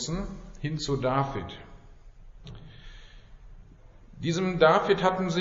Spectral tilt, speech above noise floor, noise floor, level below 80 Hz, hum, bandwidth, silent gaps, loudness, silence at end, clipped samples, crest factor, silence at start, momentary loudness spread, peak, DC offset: -4.5 dB/octave; 25 dB; -51 dBFS; -46 dBFS; none; 7.6 kHz; none; -26 LUFS; 0 s; under 0.1%; 24 dB; 0 s; 26 LU; -6 dBFS; under 0.1%